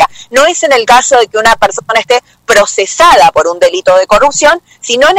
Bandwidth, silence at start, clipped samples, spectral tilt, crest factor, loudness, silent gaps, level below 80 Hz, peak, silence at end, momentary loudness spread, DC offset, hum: 16.5 kHz; 0 s; 0.9%; -1 dB/octave; 8 dB; -7 LUFS; none; -38 dBFS; 0 dBFS; 0 s; 6 LU; under 0.1%; none